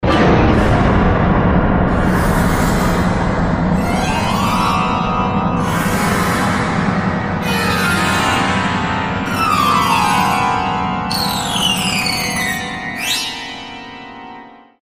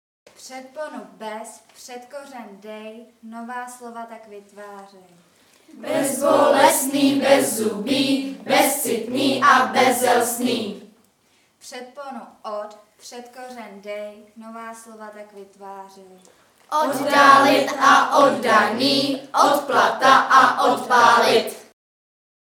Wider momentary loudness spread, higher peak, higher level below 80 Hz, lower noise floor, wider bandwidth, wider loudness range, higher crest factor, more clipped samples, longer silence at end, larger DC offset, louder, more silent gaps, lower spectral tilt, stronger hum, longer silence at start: second, 6 LU vs 24 LU; about the same, 0 dBFS vs 0 dBFS; first, -26 dBFS vs -72 dBFS; second, -37 dBFS vs -61 dBFS; second, 16 kHz vs 19 kHz; second, 3 LU vs 21 LU; second, 14 dB vs 20 dB; neither; second, 0.25 s vs 0.85 s; neither; about the same, -15 LUFS vs -17 LUFS; neither; first, -5 dB/octave vs -2.5 dB/octave; neither; second, 0 s vs 0.45 s